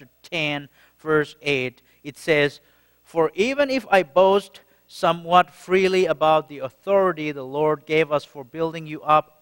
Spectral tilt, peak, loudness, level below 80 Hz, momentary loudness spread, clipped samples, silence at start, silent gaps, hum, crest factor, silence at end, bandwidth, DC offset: -5.5 dB/octave; -2 dBFS; -21 LUFS; -60 dBFS; 12 LU; under 0.1%; 0.3 s; none; none; 20 dB; 0.2 s; 16.5 kHz; under 0.1%